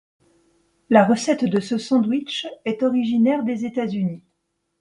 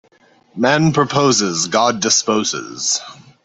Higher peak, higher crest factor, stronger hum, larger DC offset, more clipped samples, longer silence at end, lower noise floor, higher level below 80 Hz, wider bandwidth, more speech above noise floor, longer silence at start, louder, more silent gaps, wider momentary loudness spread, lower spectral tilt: about the same, -2 dBFS vs -2 dBFS; about the same, 20 dB vs 16 dB; neither; neither; neither; first, 0.6 s vs 0.3 s; first, -74 dBFS vs -53 dBFS; second, -66 dBFS vs -56 dBFS; first, 11 kHz vs 8.4 kHz; first, 54 dB vs 37 dB; first, 0.9 s vs 0.55 s; second, -21 LUFS vs -16 LUFS; neither; first, 11 LU vs 7 LU; first, -6 dB/octave vs -3 dB/octave